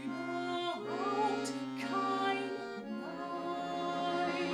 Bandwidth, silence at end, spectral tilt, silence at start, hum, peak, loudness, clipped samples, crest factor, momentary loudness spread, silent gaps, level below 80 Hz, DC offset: 12.5 kHz; 0 s; -4.5 dB/octave; 0 s; none; -20 dBFS; -36 LUFS; under 0.1%; 16 dB; 8 LU; none; -80 dBFS; under 0.1%